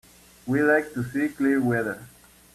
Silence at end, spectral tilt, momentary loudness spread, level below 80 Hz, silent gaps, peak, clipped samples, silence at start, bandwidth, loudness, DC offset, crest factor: 0.45 s; -7 dB/octave; 13 LU; -60 dBFS; none; -10 dBFS; under 0.1%; 0.45 s; 14.5 kHz; -24 LUFS; under 0.1%; 16 dB